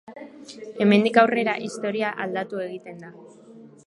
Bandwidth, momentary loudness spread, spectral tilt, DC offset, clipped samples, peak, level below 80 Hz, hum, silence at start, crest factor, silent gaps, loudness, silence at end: 11 kHz; 24 LU; -6 dB/octave; under 0.1%; under 0.1%; -2 dBFS; -74 dBFS; none; 0.1 s; 22 dB; none; -22 LUFS; 0.2 s